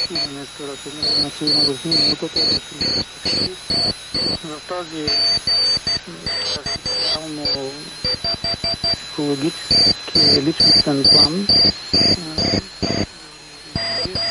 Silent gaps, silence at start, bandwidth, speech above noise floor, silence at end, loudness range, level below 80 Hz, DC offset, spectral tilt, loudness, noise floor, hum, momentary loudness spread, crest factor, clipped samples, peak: none; 0 s; 11.5 kHz; 20 dB; 0 s; 7 LU; -44 dBFS; under 0.1%; -3 dB/octave; -16 LUFS; -39 dBFS; none; 13 LU; 18 dB; under 0.1%; -2 dBFS